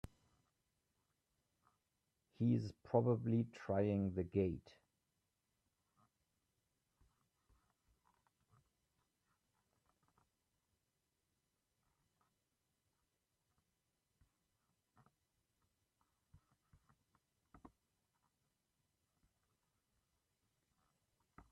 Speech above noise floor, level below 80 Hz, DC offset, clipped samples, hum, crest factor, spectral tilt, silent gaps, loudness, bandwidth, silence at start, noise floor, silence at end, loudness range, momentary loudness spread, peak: 49 dB; -76 dBFS; under 0.1%; under 0.1%; none; 26 dB; -9.5 dB/octave; none; -39 LUFS; 8.4 kHz; 2.4 s; -88 dBFS; 16.9 s; 8 LU; 5 LU; -22 dBFS